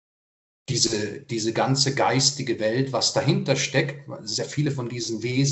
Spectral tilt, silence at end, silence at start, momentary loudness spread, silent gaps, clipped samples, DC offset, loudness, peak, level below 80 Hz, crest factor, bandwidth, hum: -4 dB/octave; 0 s; 0.7 s; 8 LU; none; under 0.1%; under 0.1%; -23 LUFS; -4 dBFS; -62 dBFS; 20 dB; 8.4 kHz; none